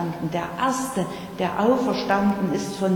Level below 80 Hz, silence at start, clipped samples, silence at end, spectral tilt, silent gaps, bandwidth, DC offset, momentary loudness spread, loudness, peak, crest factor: -54 dBFS; 0 s; under 0.1%; 0 s; -5.5 dB/octave; none; 19 kHz; under 0.1%; 7 LU; -24 LUFS; -8 dBFS; 16 dB